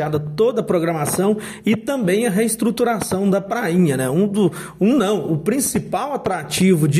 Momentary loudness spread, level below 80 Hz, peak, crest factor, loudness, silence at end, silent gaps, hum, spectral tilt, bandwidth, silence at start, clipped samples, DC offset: 5 LU; -52 dBFS; -4 dBFS; 14 dB; -19 LUFS; 0 s; none; none; -5.5 dB/octave; 16 kHz; 0 s; under 0.1%; under 0.1%